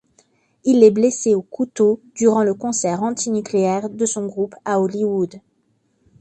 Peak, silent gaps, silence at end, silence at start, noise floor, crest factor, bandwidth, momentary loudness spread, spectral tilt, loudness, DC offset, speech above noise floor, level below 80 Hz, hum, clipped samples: 0 dBFS; none; 0.8 s; 0.65 s; -65 dBFS; 18 dB; 9.8 kHz; 11 LU; -5.5 dB/octave; -19 LUFS; under 0.1%; 47 dB; -64 dBFS; none; under 0.1%